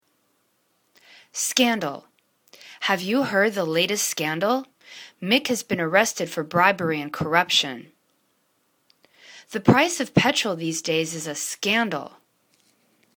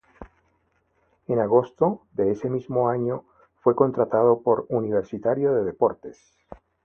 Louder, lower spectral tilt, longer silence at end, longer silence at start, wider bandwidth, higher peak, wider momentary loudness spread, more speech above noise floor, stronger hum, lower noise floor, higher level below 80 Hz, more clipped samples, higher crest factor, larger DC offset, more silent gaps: about the same, -22 LUFS vs -23 LUFS; second, -3.5 dB/octave vs -10 dB/octave; first, 1.1 s vs 0.3 s; first, 1.35 s vs 0.2 s; first, 19 kHz vs 6.6 kHz; about the same, -2 dBFS vs -4 dBFS; first, 13 LU vs 8 LU; about the same, 46 dB vs 46 dB; neither; about the same, -68 dBFS vs -68 dBFS; second, -64 dBFS vs -58 dBFS; neither; about the same, 24 dB vs 20 dB; neither; neither